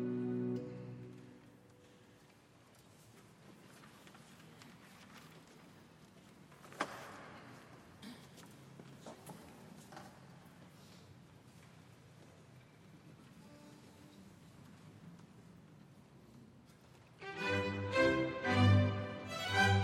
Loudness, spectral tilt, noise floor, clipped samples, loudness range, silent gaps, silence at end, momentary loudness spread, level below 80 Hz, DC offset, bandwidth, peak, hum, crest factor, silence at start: -36 LUFS; -6 dB/octave; -64 dBFS; under 0.1%; 24 LU; none; 0 s; 28 LU; -72 dBFS; under 0.1%; 13.5 kHz; -18 dBFS; none; 24 dB; 0 s